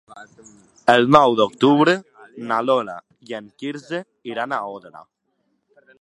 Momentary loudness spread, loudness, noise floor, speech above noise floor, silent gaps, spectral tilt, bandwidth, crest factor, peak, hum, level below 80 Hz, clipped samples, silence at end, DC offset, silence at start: 20 LU; -18 LUFS; -70 dBFS; 51 dB; none; -6 dB/octave; 11 kHz; 20 dB; 0 dBFS; none; -60 dBFS; under 0.1%; 1 s; under 0.1%; 0.15 s